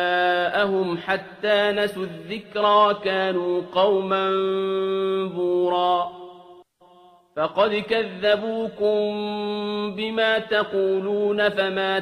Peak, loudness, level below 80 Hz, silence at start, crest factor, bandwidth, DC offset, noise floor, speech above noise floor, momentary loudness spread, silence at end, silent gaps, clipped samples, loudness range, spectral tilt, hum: -6 dBFS; -22 LUFS; -64 dBFS; 0 s; 18 dB; 13.5 kHz; under 0.1%; -53 dBFS; 31 dB; 7 LU; 0 s; none; under 0.1%; 3 LU; -6 dB/octave; none